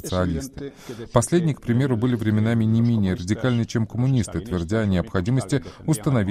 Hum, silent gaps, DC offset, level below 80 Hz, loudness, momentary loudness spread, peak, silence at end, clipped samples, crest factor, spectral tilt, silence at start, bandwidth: none; none; under 0.1%; -44 dBFS; -22 LUFS; 7 LU; -4 dBFS; 0 s; under 0.1%; 18 dB; -6.5 dB/octave; 0.05 s; 15 kHz